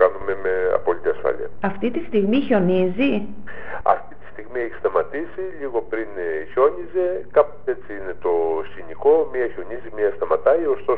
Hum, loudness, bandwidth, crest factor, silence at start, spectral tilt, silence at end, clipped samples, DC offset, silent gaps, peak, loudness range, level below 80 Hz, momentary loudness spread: none; -22 LUFS; 4.4 kHz; 20 dB; 0 s; -5.5 dB/octave; 0 s; under 0.1%; 3%; none; -2 dBFS; 3 LU; -48 dBFS; 12 LU